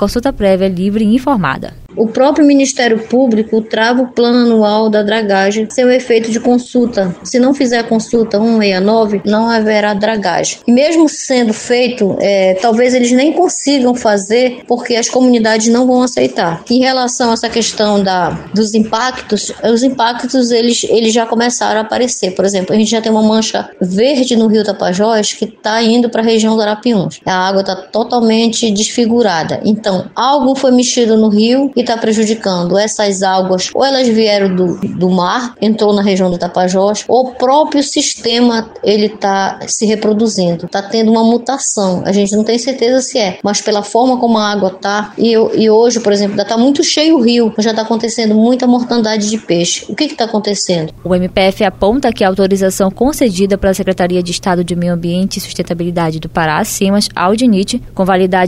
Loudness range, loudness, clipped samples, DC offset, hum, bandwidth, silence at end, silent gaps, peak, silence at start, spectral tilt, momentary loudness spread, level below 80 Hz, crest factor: 2 LU; -12 LUFS; under 0.1%; under 0.1%; none; 15 kHz; 0 s; none; 0 dBFS; 0 s; -4.5 dB/octave; 5 LU; -40 dBFS; 12 dB